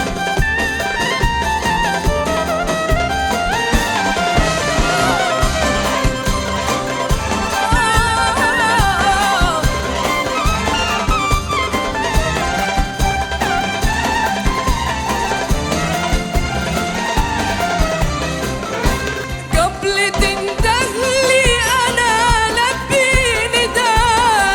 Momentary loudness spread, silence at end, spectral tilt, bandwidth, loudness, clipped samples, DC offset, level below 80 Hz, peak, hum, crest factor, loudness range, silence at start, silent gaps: 6 LU; 0 s; -3.5 dB/octave; 19.5 kHz; -16 LUFS; under 0.1%; under 0.1%; -24 dBFS; 0 dBFS; none; 16 dB; 4 LU; 0 s; none